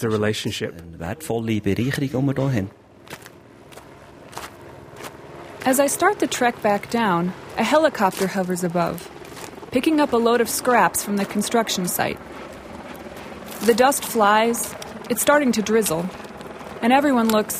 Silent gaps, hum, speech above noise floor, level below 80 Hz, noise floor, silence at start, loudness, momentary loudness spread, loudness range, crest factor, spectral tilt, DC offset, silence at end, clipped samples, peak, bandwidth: none; none; 25 dB; -54 dBFS; -45 dBFS; 0 s; -20 LUFS; 20 LU; 7 LU; 18 dB; -4.5 dB/octave; under 0.1%; 0 s; under 0.1%; -4 dBFS; 16 kHz